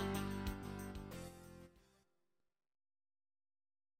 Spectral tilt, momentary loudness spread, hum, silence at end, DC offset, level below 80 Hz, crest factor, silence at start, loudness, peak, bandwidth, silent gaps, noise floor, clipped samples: -5.5 dB/octave; 18 LU; none; 2.2 s; under 0.1%; -58 dBFS; 20 dB; 0 s; -47 LUFS; -28 dBFS; 16.5 kHz; none; -88 dBFS; under 0.1%